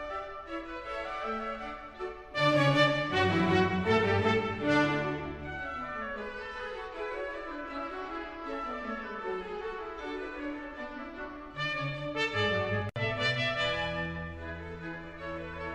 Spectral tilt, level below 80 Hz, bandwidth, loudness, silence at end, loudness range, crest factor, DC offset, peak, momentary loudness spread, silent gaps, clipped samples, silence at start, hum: -6 dB/octave; -54 dBFS; 12 kHz; -32 LUFS; 0 s; 11 LU; 22 dB; under 0.1%; -12 dBFS; 14 LU; none; under 0.1%; 0 s; none